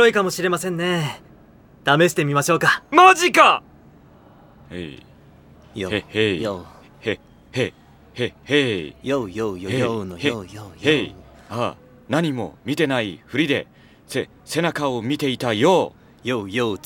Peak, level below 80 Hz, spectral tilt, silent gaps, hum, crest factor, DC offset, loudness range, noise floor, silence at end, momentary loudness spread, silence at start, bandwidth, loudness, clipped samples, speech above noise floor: 0 dBFS; -56 dBFS; -4.5 dB/octave; none; none; 22 dB; under 0.1%; 10 LU; -49 dBFS; 0.1 s; 16 LU; 0 s; 18 kHz; -20 LUFS; under 0.1%; 29 dB